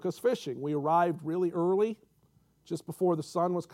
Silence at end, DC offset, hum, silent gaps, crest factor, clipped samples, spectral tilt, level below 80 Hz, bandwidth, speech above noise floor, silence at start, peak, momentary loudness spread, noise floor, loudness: 0.1 s; under 0.1%; none; none; 16 dB; under 0.1%; -7 dB/octave; -78 dBFS; 15.5 kHz; 37 dB; 0 s; -14 dBFS; 12 LU; -67 dBFS; -30 LUFS